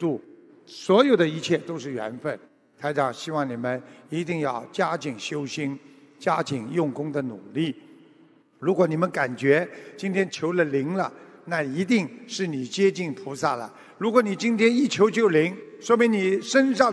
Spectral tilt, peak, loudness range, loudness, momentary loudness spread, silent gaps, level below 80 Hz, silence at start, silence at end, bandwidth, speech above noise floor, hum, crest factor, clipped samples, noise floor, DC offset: -5.5 dB/octave; -2 dBFS; 7 LU; -25 LUFS; 12 LU; none; -74 dBFS; 0 s; 0 s; 11 kHz; 32 dB; none; 22 dB; under 0.1%; -56 dBFS; under 0.1%